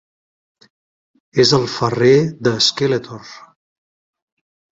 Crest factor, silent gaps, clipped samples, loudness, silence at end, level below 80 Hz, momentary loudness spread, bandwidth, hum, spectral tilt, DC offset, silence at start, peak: 18 dB; none; under 0.1%; -15 LUFS; 1.4 s; -56 dBFS; 10 LU; 7.8 kHz; none; -4.5 dB/octave; under 0.1%; 1.35 s; -2 dBFS